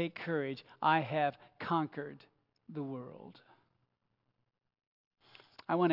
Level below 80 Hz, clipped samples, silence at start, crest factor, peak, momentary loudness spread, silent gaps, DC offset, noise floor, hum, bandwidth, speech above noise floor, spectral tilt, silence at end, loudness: -86 dBFS; under 0.1%; 0 s; 22 dB; -16 dBFS; 22 LU; 4.87-5.11 s; under 0.1%; -82 dBFS; none; 5.8 kHz; 46 dB; -4.5 dB/octave; 0 s; -35 LUFS